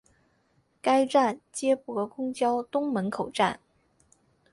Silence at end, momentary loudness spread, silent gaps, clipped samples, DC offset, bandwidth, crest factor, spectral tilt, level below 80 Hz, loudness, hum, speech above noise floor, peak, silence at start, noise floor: 0.95 s; 9 LU; none; under 0.1%; under 0.1%; 11.5 kHz; 18 dB; -4.5 dB/octave; -70 dBFS; -27 LUFS; none; 42 dB; -10 dBFS; 0.85 s; -69 dBFS